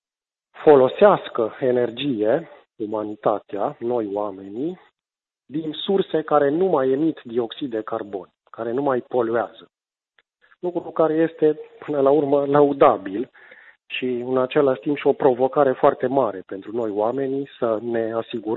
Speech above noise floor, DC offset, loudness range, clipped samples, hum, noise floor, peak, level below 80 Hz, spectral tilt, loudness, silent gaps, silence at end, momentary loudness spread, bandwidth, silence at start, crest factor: over 69 dB; under 0.1%; 6 LU; under 0.1%; none; under -90 dBFS; -2 dBFS; -68 dBFS; -9.5 dB/octave; -21 LUFS; none; 0 s; 13 LU; 4.2 kHz; 0.55 s; 18 dB